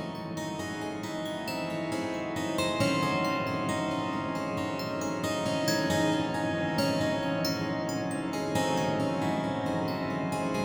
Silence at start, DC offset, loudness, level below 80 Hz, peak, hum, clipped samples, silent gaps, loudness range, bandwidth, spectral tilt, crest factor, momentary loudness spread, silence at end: 0 s; under 0.1%; -30 LUFS; -60 dBFS; -14 dBFS; none; under 0.1%; none; 2 LU; over 20 kHz; -5 dB/octave; 16 dB; 7 LU; 0 s